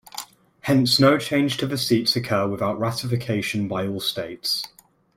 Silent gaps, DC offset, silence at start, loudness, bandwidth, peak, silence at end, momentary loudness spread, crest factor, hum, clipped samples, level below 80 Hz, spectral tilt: none; under 0.1%; 0.15 s; -22 LUFS; 16.5 kHz; -4 dBFS; 0.5 s; 13 LU; 18 dB; none; under 0.1%; -58 dBFS; -5 dB/octave